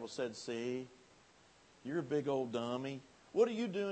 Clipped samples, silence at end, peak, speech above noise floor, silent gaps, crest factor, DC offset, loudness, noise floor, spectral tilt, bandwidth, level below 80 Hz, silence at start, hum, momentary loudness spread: under 0.1%; 0 s; -20 dBFS; 28 dB; none; 20 dB; under 0.1%; -38 LUFS; -65 dBFS; -5.5 dB/octave; 8.4 kHz; -80 dBFS; 0 s; none; 12 LU